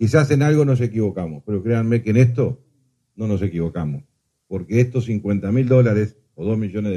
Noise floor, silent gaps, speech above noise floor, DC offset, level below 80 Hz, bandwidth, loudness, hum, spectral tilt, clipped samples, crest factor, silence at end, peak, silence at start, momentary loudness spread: -64 dBFS; none; 46 dB; under 0.1%; -48 dBFS; 11 kHz; -20 LUFS; none; -8.5 dB/octave; under 0.1%; 18 dB; 0 s; -2 dBFS; 0 s; 13 LU